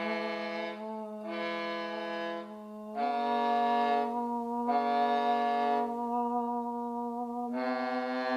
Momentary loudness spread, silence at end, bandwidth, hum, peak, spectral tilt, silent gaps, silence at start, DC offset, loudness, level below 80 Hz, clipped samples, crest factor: 10 LU; 0 s; 12.5 kHz; none; -18 dBFS; -5.5 dB/octave; none; 0 s; under 0.1%; -32 LUFS; -78 dBFS; under 0.1%; 14 dB